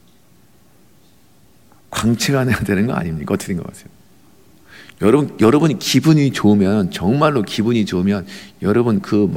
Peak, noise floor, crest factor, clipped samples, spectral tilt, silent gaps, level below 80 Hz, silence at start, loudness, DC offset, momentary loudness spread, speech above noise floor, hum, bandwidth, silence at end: -2 dBFS; -52 dBFS; 16 dB; under 0.1%; -6 dB/octave; none; -48 dBFS; 1.9 s; -16 LUFS; 0.3%; 10 LU; 37 dB; none; 16.5 kHz; 0 s